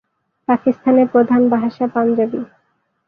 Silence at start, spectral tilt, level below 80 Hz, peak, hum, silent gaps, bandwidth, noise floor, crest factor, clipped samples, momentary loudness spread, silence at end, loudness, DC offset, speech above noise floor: 0.5 s; -10 dB/octave; -62 dBFS; -2 dBFS; none; none; 4.9 kHz; -65 dBFS; 14 dB; under 0.1%; 13 LU; 0.6 s; -16 LUFS; under 0.1%; 50 dB